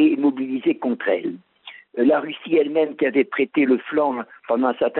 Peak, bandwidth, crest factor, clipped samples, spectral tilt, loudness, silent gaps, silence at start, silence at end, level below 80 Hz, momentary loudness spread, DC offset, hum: -6 dBFS; 4.1 kHz; 14 dB; under 0.1%; -3.5 dB/octave; -21 LUFS; none; 0 s; 0 s; -68 dBFS; 12 LU; under 0.1%; none